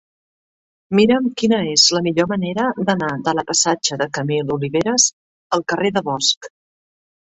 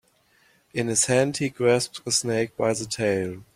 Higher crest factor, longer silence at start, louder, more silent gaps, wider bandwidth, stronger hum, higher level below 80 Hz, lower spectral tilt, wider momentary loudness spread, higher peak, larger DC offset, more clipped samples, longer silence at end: about the same, 18 dB vs 18 dB; first, 0.9 s vs 0.75 s; first, -17 LUFS vs -24 LUFS; first, 5.13-5.50 s, 6.37-6.41 s vs none; second, 8.4 kHz vs 15.5 kHz; neither; about the same, -58 dBFS vs -60 dBFS; about the same, -3 dB/octave vs -3.5 dB/octave; about the same, 8 LU vs 6 LU; first, -2 dBFS vs -8 dBFS; neither; neither; first, 0.85 s vs 0.15 s